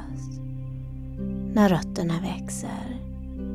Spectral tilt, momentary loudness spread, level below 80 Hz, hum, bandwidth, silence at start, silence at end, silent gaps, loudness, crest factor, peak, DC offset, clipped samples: -6.5 dB/octave; 15 LU; -40 dBFS; none; 14.5 kHz; 0 s; 0 s; none; -28 LUFS; 22 dB; -6 dBFS; under 0.1%; under 0.1%